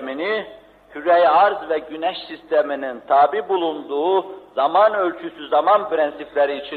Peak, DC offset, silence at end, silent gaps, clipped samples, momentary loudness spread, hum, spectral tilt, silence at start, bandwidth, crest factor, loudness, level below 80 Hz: -4 dBFS; under 0.1%; 0 s; none; under 0.1%; 11 LU; none; -6 dB/octave; 0 s; 4.8 kHz; 14 dB; -19 LUFS; -64 dBFS